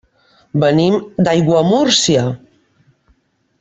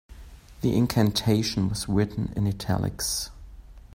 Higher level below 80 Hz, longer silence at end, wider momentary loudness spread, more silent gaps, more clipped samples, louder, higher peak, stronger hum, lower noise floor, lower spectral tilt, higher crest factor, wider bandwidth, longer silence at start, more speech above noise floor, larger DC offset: second, -52 dBFS vs -44 dBFS; first, 1.25 s vs 0.15 s; first, 10 LU vs 6 LU; neither; neither; first, -14 LUFS vs -26 LUFS; first, 0 dBFS vs -8 dBFS; neither; first, -59 dBFS vs -45 dBFS; about the same, -5 dB/octave vs -5.5 dB/octave; about the same, 16 dB vs 18 dB; second, 8.4 kHz vs 16 kHz; first, 0.55 s vs 0.1 s; first, 46 dB vs 21 dB; neither